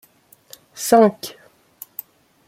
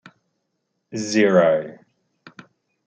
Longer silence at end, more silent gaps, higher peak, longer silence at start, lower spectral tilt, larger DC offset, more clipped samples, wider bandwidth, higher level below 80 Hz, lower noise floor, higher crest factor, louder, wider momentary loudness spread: about the same, 1.2 s vs 1.15 s; neither; about the same, -2 dBFS vs -4 dBFS; second, 0.75 s vs 0.9 s; about the same, -4.5 dB/octave vs -5 dB/octave; neither; neither; first, 16.5 kHz vs 9 kHz; about the same, -66 dBFS vs -70 dBFS; second, -53 dBFS vs -75 dBFS; about the same, 20 dB vs 20 dB; first, -16 LUFS vs -19 LUFS; first, 25 LU vs 18 LU